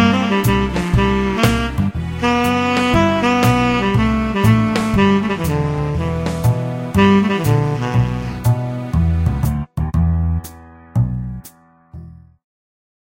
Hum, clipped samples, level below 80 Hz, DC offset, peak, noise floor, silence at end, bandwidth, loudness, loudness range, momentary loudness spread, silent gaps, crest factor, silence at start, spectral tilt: none; under 0.1%; -28 dBFS; under 0.1%; 0 dBFS; -44 dBFS; 1.05 s; 16.5 kHz; -17 LUFS; 6 LU; 7 LU; none; 16 dB; 0 s; -6.5 dB/octave